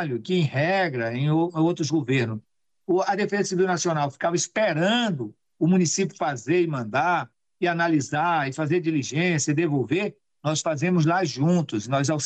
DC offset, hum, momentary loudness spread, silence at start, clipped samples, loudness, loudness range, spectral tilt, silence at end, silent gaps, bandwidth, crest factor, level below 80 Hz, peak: under 0.1%; none; 6 LU; 0 s; under 0.1%; -24 LUFS; 1 LU; -5 dB/octave; 0 s; none; 9.2 kHz; 12 dB; -68 dBFS; -12 dBFS